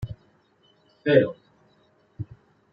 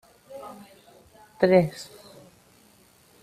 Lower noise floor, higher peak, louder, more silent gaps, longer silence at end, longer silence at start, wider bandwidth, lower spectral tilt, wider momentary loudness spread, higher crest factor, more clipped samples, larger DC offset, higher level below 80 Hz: first, -63 dBFS vs -58 dBFS; about the same, -4 dBFS vs -4 dBFS; about the same, -22 LUFS vs -22 LUFS; neither; second, 0.5 s vs 1.4 s; second, 0 s vs 0.3 s; second, 5.4 kHz vs 14.5 kHz; first, -9 dB/octave vs -7 dB/octave; second, 24 LU vs 27 LU; about the same, 24 dB vs 24 dB; neither; neither; first, -56 dBFS vs -62 dBFS